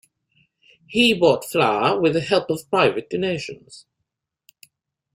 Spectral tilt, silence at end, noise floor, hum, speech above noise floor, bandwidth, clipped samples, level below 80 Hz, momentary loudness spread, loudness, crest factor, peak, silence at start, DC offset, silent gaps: -5 dB/octave; 1.35 s; -79 dBFS; none; 60 dB; 16 kHz; under 0.1%; -60 dBFS; 10 LU; -20 LUFS; 18 dB; -4 dBFS; 0.9 s; under 0.1%; none